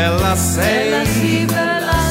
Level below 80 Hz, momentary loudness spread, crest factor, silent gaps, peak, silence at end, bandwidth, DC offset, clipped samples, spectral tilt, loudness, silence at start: -28 dBFS; 1 LU; 12 dB; none; -4 dBFS; 0 s; 16.5 kHz; under 0.1%; under 0.1%; -4.5 dB/octave; -16 LUFS; 0 s